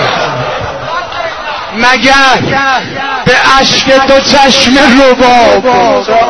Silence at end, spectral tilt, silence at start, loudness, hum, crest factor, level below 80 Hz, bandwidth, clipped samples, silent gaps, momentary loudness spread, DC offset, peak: 0 s; -3.5 dB/octave; 0 s; -6 LUFS; none; 8 dB; -32 dBFS; 11 kHz; 2%; none; 12 LU; 2%; 0 dBFS